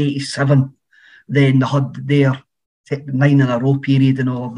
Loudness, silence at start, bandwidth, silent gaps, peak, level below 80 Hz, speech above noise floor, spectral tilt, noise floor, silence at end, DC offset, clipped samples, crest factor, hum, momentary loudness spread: -16 LUFS; 0 s; 10.5 kHz; 2.66-2.84 s; 0 dBFS; -62 dBFS; 34 dB; -7.5 dB/octave; -49 dBFS; 0 s; under 0.1%; under 0.1%; 16 dB; none; 10 LU